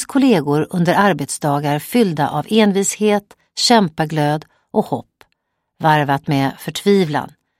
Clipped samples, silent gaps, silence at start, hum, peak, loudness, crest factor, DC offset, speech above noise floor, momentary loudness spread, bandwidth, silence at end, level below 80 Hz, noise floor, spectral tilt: under 0.1%; none; 0 s; none; 0 dBFS; -17 LUFS; 16 dB; under 0.1%; 54 dB; 7 LU; 16.5 kHz; 0.3 s; -58 dBFS; -70 dBFS; -5 dB/octave